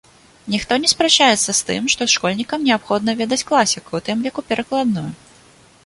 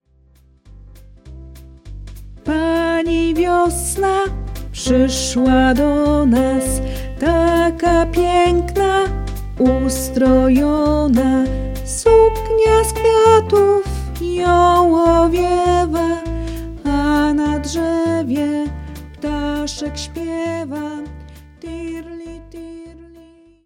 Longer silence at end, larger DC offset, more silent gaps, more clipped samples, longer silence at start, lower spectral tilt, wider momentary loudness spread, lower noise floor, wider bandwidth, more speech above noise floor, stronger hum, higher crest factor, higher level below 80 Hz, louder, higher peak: about the same, 0.7 s vs 0.6 s; neither; neither; neither; second, 0.45 s vs 0.7 s; second, -2.5 dB/octave vs -5.5 dB/octave; second, 11 LU vs 17 LU; about the same, -49 dBFS vs -51 dBFS; second, 11.5 kHz vs 17 kHz; second, 31 dB vs 37 dB; neither; about the same, 18 dB vs 16 dB; second, -54 dBFS vs -28 dBFS; about the same, -17 LUFS vs -16 LUFS; about the same, 0 dBFS vs 0 dBFS